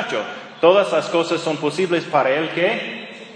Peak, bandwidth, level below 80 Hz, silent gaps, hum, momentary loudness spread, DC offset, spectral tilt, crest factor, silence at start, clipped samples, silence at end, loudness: -2 dBFS; 10 kHz; -72 dBFS; none; none; 11 LU; under 0.1%; -4.5 dB/octave; 18 dB; 0 s; under 0.1%; 0 s; -19 LUFS